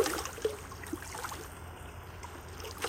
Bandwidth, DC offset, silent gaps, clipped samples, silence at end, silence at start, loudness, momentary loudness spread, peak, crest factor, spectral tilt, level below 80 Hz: 16.5 kHz; under 0.1%; none; under 0.1%; 0 s; 0 s; -40 LUFS; 11 LU; -16 dBFS; 24 dB; -3.5 dB/octave; -52 dBFS